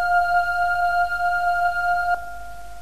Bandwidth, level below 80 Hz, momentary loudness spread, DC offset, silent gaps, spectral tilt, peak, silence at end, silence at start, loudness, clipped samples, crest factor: 14 kHz; -44 dBFS; 13 LU; 2%; none; -2.5 dB/octave; -8 dBFS; 0 s; 0 s; -21 LUFS; under 0.1%; 12 dB